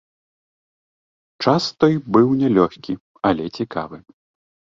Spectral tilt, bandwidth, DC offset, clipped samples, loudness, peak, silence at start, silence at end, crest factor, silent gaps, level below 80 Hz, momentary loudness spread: -7 dB/octave; 7.6 kHz; under 0.1%; under 0.1%; -19 LUFS; -2 dBFS; 1.4 s; 0.7 s; 18 dB; 3.00-3.14 s; -54 dBFS; 13 LU